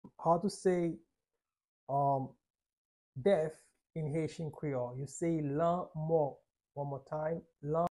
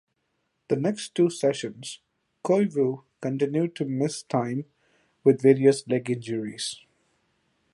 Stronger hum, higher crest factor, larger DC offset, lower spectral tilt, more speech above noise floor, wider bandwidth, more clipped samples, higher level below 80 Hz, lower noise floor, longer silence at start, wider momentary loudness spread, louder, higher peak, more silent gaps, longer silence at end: neither; about the same, 18 dB vs 22 dB; neither; first, -7.5 dB/octave vs -6 dB/octave; first, over 56 dB vs 51 dB; about the same, 11.5 kHz vs 11.5 kHz; neither; about the same, -70 dBFS vs -72 dBFS; first, under -90 dBFS vs -75 dBFS; second, 0.05 s vs 0.7 s; second, 10 LU vs 15 LU; second, -35 LUFS vs -25 LUFS; second, -18 dBFS vs -6 dBFS; first, 1.68-1.87 s, 2.50-2.54 s, 2.73-3.13 s vs none; second, 0 s vs 1 s